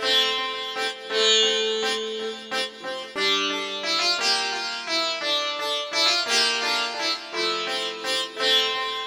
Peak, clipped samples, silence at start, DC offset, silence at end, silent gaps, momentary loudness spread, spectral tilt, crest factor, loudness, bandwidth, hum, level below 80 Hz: -8 dBFS; under 0.1%; 0 s; under 0.1%; 0 s; none; 9 LU; 0.5 dB/octave; 16 dB; -22 LUFS; 19.5 kHz; none; -70 dBFS